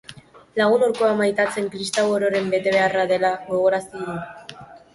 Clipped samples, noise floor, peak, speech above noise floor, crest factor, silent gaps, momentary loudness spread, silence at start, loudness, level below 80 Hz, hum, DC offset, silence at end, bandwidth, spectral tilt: under 0.1%; -44 dBFS; -6 dBFS; 24 dB; 16 dB; none; 12 LU; 0.1 s; -21 LUFS; -62 dBFS; none; under 0.1%; 0.15 s; 11.5 kHz; -4.5 dB/octave